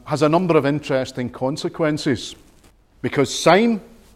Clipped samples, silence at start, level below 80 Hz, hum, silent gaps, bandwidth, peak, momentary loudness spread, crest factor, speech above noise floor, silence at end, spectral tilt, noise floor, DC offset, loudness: under 0.1%; 0.05 s; -52 dBFS; none; none; 15.5 kHz; -2 dBFS; 12 LU; 18 dB; 33 dB; 0.3 s; -5.5 dB/octave; -52 dBFS; under 0.1%; -20 LUFS